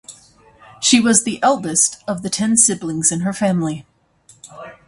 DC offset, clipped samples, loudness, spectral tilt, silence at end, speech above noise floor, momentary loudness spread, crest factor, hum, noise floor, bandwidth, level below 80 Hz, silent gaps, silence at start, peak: under 0.1%; under 0.1%; -16 LUFS; -3 dB/octave; 0.15 s; 35 dB; 13 LU; 18 dB; none; -52 dBFS; 11.5 kHz; -58 dBFS; none; 0.1 s; 0 dBFS